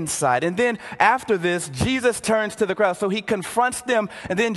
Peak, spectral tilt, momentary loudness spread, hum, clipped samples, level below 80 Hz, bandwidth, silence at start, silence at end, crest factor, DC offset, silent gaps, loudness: -2 dBFS; -4 dB/octave; 5 LU; none; under 0.1%; -48 dBFS; 12.5 kHz; 0 s; 0 s; 20 dB; under 0.1%; none; -21 LUFS